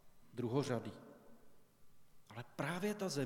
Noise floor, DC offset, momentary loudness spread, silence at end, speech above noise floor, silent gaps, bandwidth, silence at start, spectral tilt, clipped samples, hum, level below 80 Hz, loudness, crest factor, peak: -61 dBFS; under 0.1%; 17 LU; 0 s; 21 dB; none; 18 kHz; 0.05 s; -5.5 dB/octave; under 0.1%; none; -74 dBFS; -41 LUFS; 20 dB; -22 dBFS